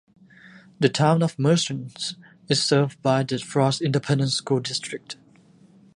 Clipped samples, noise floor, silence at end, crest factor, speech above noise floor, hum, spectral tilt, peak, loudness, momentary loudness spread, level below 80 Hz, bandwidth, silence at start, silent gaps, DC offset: under 0.1%; -54 dBFS; 0.8 s; 20 dB; 31 dB; none; -5 dB/octave; -4 dBFS; -23 LUFS; 12 LU; -66 dBFS; 11 kHz; 0.8 s; none; under 0.1%